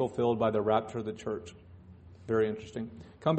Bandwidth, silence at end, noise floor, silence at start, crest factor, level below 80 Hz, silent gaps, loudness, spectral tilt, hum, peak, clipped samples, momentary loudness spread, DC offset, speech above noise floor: 8.4 kHz; 0 s; -52 dBFS; 0 s; 20 dB; -62 dBFS; none; -32 LUFS; -7.5 dB/octave; none; -12 dBFS; under 0.1%; 14 LU; under 0.1%; 21 dB